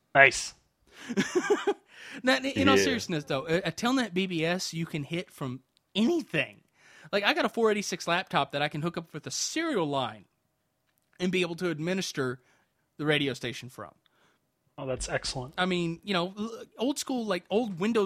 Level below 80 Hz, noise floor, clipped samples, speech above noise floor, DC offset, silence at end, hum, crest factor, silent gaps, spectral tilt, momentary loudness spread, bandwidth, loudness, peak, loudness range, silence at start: -58 dBFS; -76 dBFS; under 0.1%; 48 dB; under 0.1%; 0 s; none; 26 dB; none; -4 dB/octave; 13 LU; 16 kHz; -29 LUFS; -4 dBFS; 6 LU; 0.15 s